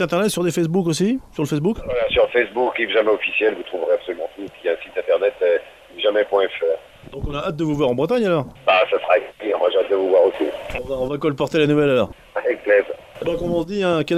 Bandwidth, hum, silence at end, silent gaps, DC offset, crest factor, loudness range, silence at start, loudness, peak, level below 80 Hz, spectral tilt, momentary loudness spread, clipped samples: 14.5 kHz; none; 0 s; none; under 0.1%; 16 dB; 3 LU; 0 s; -20 LUFS; -2 dBFS; -44 dBFS; -5.5 dB/octave; 9 LU; under 0.1%